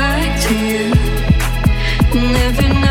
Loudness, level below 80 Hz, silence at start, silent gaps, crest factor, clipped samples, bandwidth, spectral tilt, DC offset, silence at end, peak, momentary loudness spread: -15 LUFS; -18 dBFS; 0 s; none; 12 dB; under 0.1%; 17 kHz; -5.5 dB/octave; under 0.1%; 0 s; 0 dBFS; 2 LU